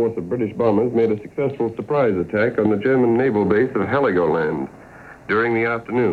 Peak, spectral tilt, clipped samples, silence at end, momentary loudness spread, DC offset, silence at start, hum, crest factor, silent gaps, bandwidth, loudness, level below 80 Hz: -4 dBFS; -9 dB/octave; under 0.1%; 0 s; 7 LU; under 0.1%; 0 s; none; 14 dB; none; 6.4 kHz; -19 LUFS; -54 dBFS